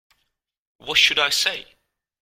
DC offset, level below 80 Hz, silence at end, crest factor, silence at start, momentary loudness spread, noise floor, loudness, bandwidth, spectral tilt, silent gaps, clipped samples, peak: under 0.1%; -60 dBFS; 0.6 s; 22 dB; 0.85 s; 18 LU; -73 dBFS; -18 LUFS; 16.5 kHz; 1 dB/octave; none; under 0.1%; -2 dBFS